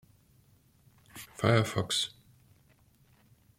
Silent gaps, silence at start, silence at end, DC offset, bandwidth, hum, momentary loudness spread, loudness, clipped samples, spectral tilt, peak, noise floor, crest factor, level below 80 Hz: none; 1.15 s; 1.5 s; under 0.1%; 16.5 kHz; none; 21 LU; -29 LUFS; under 0.1%; -4.5 dB/octave; -12 dBFS; -64 dBFS; 24 dB; -66 dBFS